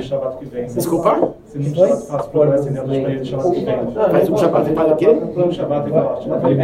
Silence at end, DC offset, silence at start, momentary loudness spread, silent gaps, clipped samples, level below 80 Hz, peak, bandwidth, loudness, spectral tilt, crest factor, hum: 0 s; under 0.1%; 0 s; 8 LU; none; under 0.1%; -48 dBFS; 0 dBFS; 16 kHz; -17 LUFS; -7.5 dB/octave; 16 dB; none